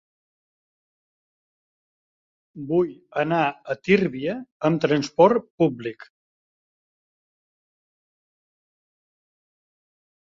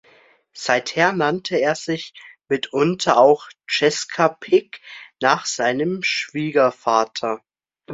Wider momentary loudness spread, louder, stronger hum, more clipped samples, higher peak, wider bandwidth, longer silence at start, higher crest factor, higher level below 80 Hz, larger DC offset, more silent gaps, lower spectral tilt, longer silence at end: about the same, 12 LU vs 11 LU; about the same, -22 LUFS vs -20 LUFS; neither; neither; second, -4 dBFS vs 0 dBFS; about the same, 7.6 kHz vs 8 kHz; first, 2.55 s vs 0.55 s; about the same, 24 dB vs 20 dB; about the same, -66 dBFS vs -66 dBFS; neither; first, 4.52-4.60 s, 5.50-5.58 s vs none; first, -7 dB/octave vs -4 dB/octave; first, 4.25 s vs 0 s